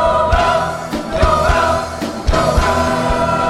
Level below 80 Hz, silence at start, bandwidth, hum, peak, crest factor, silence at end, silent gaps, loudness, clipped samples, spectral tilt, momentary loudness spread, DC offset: -22 dBFS; 0 s; 15.5 kHz; none; -2 dBFS; 12 dB; 0 s; none; -15 LUFS; under 0.1%; -5 dB/octave; 8 LU; under 0.1%